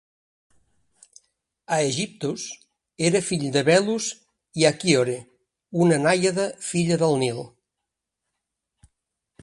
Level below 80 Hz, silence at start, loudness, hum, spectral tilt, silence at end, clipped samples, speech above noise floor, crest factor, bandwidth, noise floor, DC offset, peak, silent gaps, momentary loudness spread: -64 dBFS; 1.7 s; -22 LUFS; none; -4.5 dB/octave; 1.95 s; under 0.1%; 62 dB; 22 dB; 11.5 kHz; -84 dBFS; under 0.1%; -2 dBFS; none; 16 LU